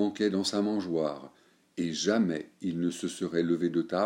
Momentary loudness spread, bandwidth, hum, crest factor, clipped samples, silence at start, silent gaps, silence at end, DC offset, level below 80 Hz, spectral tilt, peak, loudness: 8 LU; 15.5 kHz; none; 18 dB; under 0.1%; 0 s; none; 0 s; under 0.1%; -72 dBFS; -5 dB/octave; -12 dBFS; -30 LUFS